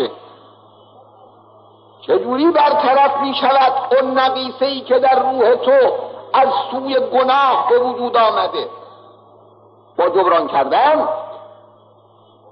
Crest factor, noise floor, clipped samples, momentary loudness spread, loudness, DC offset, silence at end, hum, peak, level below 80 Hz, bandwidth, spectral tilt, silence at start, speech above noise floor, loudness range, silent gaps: 12 dB; -49 dBFS; under 0.1%; 9 LU; -15 LUFS; under 0.1%; 1.05 s; none; -4 dBFS; -72 dBFS; 5.8 kHz; -6.5 dB/octave; 0 s; 35 dB; 4 LU; none